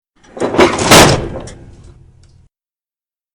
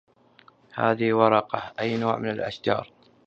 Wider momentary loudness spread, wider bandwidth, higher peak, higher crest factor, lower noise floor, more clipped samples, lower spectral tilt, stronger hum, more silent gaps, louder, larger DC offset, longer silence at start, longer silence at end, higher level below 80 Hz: first, 19 LU vs 9 LU; first, over 20 kHz vs 7.6 kHz; first, 0 dBFS vs -4 dBFS; second, 14 dB vs 22 dB; first, under -90 dBFS vs -57 dBFS; first, 0.7% vs under 0.1%; second, -3.5 dB/octave vs -7.5 dB/octave; neither; neither; first, -9 LUFS vs -25 LUFS; neither; second, 0.35 s vs 0.75 s; first, 1.8 s vs 0.4 s; first, -32 dBFS vs -64 dBFS